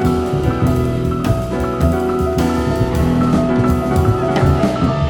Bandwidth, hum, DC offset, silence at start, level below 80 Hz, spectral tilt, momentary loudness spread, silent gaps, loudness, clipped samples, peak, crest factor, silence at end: 19.5 kHz; none; under 0.1%; 0 s; -26 dBFS; -7.5 dB/octave; 3 LU; none; -16 LUFS; under 0.1%; -2 dBFS; 14 dB; 0 s